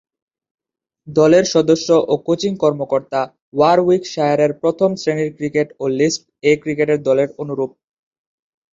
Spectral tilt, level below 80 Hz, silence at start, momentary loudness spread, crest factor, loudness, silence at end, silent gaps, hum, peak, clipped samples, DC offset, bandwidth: -5.5 dB/octave; -60 dBFS; 1.05 s; 9 LU; 16 dB; -17 LUFS; 1.05 s; 3.42-3.52 s; none; -2 dBFS; under 0.1%; under 0.1%; 7.8 kHz